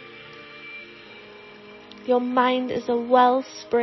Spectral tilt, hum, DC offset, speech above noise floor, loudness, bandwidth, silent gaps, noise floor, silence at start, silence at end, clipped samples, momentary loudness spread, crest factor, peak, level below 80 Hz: -5 dB/octave; none; under 0.1%; 24 dB; -21 LUFS; 6 kHz; none; -44 dBFS; 0 s; 0 s; under 0.1%; 25 LU; 18 dB; -6 dBFS; -66 dBFS